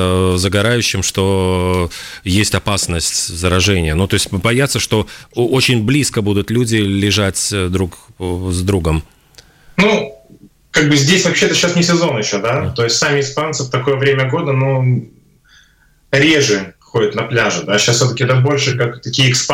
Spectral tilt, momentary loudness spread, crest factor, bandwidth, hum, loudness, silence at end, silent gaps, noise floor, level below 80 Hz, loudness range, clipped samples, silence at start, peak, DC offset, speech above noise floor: -4 dB/octave; 7 LU; 12 dB; 16.5 kHz; none; -14 LUFS; 0 s; none; -52 dBFS; -36 dBFS; 3 LU; under 0.1%; 0 s; -2 dBFS; under 0.1%; 37 dB